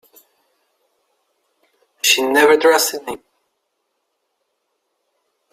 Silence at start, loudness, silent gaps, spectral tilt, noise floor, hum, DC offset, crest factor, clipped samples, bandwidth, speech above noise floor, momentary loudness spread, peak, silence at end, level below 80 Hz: 2.05 s; -14 LUFS; none; -0.5 dB/octave; -72 dBFS; none; under 0.1%; 20 dB; under 0.1%; 16 kHz; 58 dB; 19 LU; 0 dBFS; 2.35 s; -68 dBFS